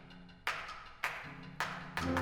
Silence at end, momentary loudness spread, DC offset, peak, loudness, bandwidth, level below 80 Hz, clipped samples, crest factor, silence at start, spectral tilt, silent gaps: 0 s; 9 LU; under 0.1%; -18 dBFS; -40 LUFS; 19.5 kHz; -60 dBFS; under 0.1%; 22 dB; 0 s; -4.5 dB/octave; none